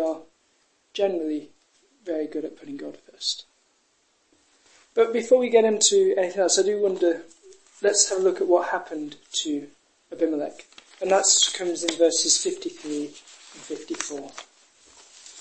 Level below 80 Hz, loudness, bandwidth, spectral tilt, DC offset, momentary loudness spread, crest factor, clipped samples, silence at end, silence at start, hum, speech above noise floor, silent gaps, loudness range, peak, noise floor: -74 dBFS; -23 LUFS; 8.8 kHz; -1.5 dB/octave; under 0.1%; 19 LU; 22 dB; under 0.1%; 0 s; 0 s; none; 43 dB; none; 10 LU; -4 dBFS; -67 dBFS